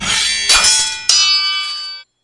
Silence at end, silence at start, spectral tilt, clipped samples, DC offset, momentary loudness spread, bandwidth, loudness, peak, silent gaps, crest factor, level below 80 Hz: 0.2 s; 0 s; 2 dB/octave; under 0.1%; under 0.1%; 13 LU; 12 kHz; -11 LUFS; 0 dBFS; none; 16 dB; -42 dBFS